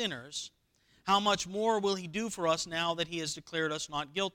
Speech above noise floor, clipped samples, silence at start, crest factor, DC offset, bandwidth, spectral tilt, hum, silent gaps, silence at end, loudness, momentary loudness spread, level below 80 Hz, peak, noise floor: 27 dB; under 0.1%; 0 s; 18 dB; under 0.1%; 18.5 kHz; -3 dB/octave; none; none; 0.05 s; -32 LUFS; 11 LU; -66 dBFS; -14 dBFS; -59 dBFS